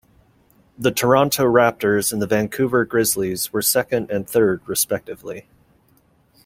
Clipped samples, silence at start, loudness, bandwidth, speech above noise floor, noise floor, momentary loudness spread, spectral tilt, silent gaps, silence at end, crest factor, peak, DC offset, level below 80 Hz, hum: under 0.1%; 0.8 s; -19 LUFS; 16.5 kHz; 39 dB; -58 dBFS; 8 LU; -4 dB/octave; none; 1.05 s; 20 dB; -2 dBFS; under 0.1%; -54 dBFS; none